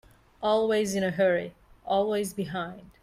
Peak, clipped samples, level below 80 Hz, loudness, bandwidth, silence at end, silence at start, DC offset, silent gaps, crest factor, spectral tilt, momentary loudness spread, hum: -14 dBFS; under 0.1%; -60 dBFS; -27 LUFS; 15.5 kHz; 0.15 s; 0.4 s; under 0.1%; none; 14 dB; -5 dB/octave; 12 LU; none